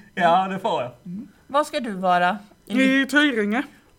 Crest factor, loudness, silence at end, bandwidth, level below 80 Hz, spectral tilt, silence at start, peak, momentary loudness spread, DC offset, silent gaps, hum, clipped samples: 18 dB; -21 LUFS; 0.3 s; 18 kHz; -62 dBFS; -5 dB/octave; 0.15 s; -4 dBFS; 15 LU; under 0.1%; none; none; under 0.1%